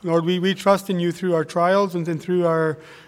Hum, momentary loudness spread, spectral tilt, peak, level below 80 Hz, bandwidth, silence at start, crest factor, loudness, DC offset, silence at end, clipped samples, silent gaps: none; 5 LU; -6.5 dB/octave; -4 dBFS; -66 dBFS; 15.5 kHz; 0.05 s; 16 dB; -21 LUFS; under 0.1%; 0.1 s; under 0.1%; none